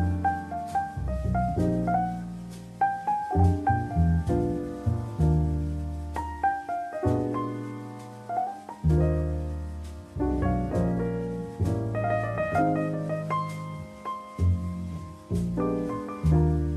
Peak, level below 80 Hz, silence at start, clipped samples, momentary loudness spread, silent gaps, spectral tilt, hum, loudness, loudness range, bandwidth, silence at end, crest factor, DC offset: -10 dBFS; -36 dBFS; 0 s; under 0.1%; 12 LU; none; -9 dB/octave; none; -28 LUFS; 4 LU; 12.5 kHz; 0 s; 16 dB; under 0.1%